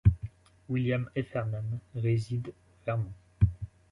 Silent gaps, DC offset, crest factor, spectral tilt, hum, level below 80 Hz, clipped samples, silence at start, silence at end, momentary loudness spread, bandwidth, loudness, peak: none; under 0.1%; 22 dB; -9 dB/octave; none; -40 dBFS; under 0.1%; 0.05 s; 0.25 s; 11 LU; 10.5 kHz; -32 LUFS; -10 dBFS